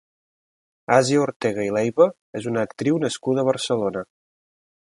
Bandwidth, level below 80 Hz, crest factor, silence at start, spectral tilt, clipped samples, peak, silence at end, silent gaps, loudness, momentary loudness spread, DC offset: 11.5 kHz; -64 dBFS; 22 dB; 0.9 s; -5 dB/octave; under 0.1%; -2 dBFS; 0.9 s; 1.36-1.40 s, 2.21-2.33 s; -22 LUFS; 11 LU; under 0.1%